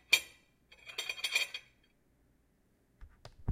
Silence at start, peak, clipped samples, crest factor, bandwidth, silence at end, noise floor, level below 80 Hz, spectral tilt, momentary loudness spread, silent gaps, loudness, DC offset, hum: 0.1 s; -10 dBFS; under 0.1%; 30 dB; 16 kHz; 0 s; -72 dBFS; -66 dBFS; -0.5 dB/octave; 21 LU; none; -34 LUFS; under 0.1%; none